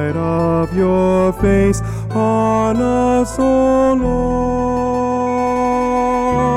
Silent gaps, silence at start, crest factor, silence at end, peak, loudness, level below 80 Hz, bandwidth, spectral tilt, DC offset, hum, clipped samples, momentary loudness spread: none; 0 s; 10 dB; 0 s; -4 dBFS; -15 LUFS; -30 dBFS; 13.5 kHz; -7.5 dB/octave; under 0.1%; none; under 0.1%; 4 LU